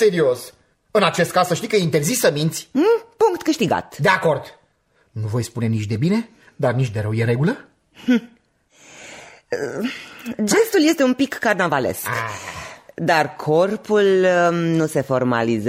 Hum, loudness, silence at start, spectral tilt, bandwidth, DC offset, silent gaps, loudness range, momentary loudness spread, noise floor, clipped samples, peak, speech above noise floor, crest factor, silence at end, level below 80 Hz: none; -19 LUFS; 0 s; -5 dB/octave; 16 kHz; under 0.1%; none; 5 LU; 13 LU; -62 dBFS; under 0.1%; -2 dBFS; 43 dB; 18 dB; 0 s; -58 dBFS